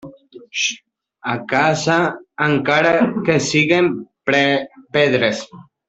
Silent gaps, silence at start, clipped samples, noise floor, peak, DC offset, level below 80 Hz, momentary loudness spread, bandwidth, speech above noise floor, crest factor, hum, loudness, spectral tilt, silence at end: none; 0.05 s; under 0.1%; -40 dBFS; 0 dBFS; under 0.1%; -58 dBFS; 10 LU; 8.4 kHz; 23 dB; 18 dB; none; -17 LUFS; -4.5 dB/octave; 0.25 s